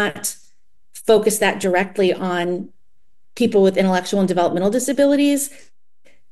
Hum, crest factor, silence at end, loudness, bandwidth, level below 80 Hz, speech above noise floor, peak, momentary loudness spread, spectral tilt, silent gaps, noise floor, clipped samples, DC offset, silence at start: none; 16 dB; 0.8 s; -18 LUFS; 13 kHz; -56 dBFS; 52 dB; -2 dBFS; 11 LU; -4.5 dB/octave; none; -69 dBFS; under 0.1%; 0.9%; 0 s